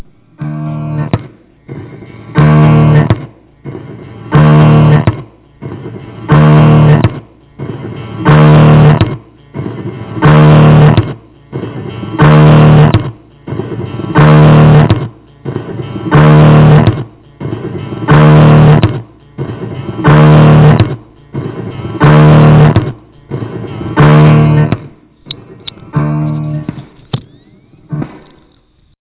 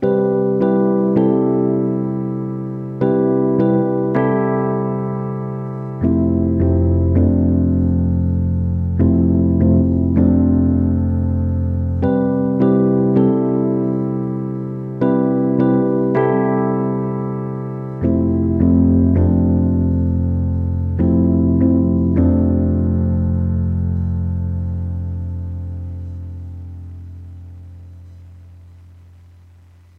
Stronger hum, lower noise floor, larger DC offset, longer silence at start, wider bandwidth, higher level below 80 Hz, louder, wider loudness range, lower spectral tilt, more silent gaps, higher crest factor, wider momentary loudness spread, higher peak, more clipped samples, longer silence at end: neither; about the same, -49 dBFS vs -46 dBFS; neither; first, 0.4 s vs 0 s; first, 4 kHz vs 2.8 kHz; about the same, -28 dBFS vs -32 dBFS; first, -6 LUFS vs -17 LUFS; second, 5 LU vs 9 LU; about the same, -12 dB/octave vs -12.5 dB/octave; neither; second, 8 dB vs 14 dB; first, 22 LU vs 11 LU; about the same, 0 dBFS vs -2 dBFS; neither; second, 0.95 s vs 1.25 s